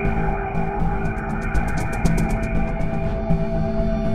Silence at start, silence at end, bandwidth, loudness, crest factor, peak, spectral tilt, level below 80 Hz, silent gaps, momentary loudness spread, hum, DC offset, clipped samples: 0 s; 0 s; 14 kHz; -24 LUFS; 16 dB; -4 dBFS; -7.5 dB/octave; -26 dBFS; none; 3 LU; none; 4%; under 0.1%